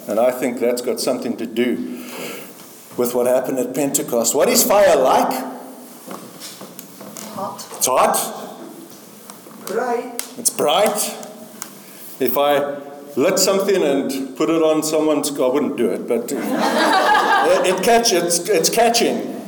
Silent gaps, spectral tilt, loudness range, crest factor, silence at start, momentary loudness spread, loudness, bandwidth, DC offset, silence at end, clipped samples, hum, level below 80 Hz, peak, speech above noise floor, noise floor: none; -2.5 dB/octave; 6 LU; 18 dB; 0 s; 20 LU; -17 LUFS; 19.5 kHz; under 0.1%; 0 s; under 0.1%; none; -60 dBFS; 0 dBFS; 22 dB; -39 dBFS